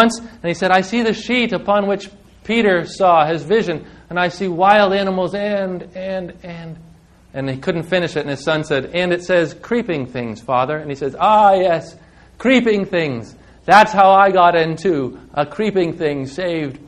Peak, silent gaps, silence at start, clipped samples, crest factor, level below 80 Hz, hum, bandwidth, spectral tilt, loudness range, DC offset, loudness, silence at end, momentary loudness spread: 0 dBFS; none; 0 s; under 0.1%; 16 dB; -50 dBFS; none; 11.5 kHz; -5.5 dB/octave; 8 LU; under 0.1%; -16 LUFS; 0.05 s; 14 LU